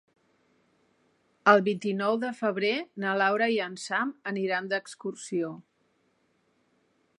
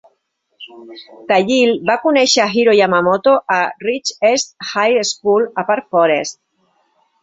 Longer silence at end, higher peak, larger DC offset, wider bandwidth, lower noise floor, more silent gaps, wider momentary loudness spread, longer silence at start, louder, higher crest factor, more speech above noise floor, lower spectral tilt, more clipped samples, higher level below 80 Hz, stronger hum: first, 1.6 s vs 0.9 s; about the same, -4 dBFS vs -2 dBFS; neither; first, 11.5 kHz vs 8 kHz; first, -71 dBFS vs -66 dBFS; neither; first, 11 LU vs 8 LU; first, 1.45 s vs 0.6 s; second, -28 LUFS vs -14 LUFS; first, 26 dB vs 14 dB; second, 43 dB vs 51 dB; first, -5 dB/octave vs -3 dB/octave; neither; second, -84 dBFS vs -62 dBFS; neither